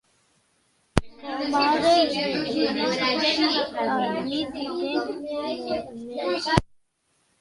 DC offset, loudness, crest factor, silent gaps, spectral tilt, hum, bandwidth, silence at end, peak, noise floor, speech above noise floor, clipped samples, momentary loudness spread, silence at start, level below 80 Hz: under 0.1%; -24 LUFS; 26 dB; none; -5 dB/octave; none; 11.5 kHz; 0.75 s; 0 dBFS; -69 dBFS; 45 dB; under 0.1%; 10 LU; 0.95 s; -46 dBFS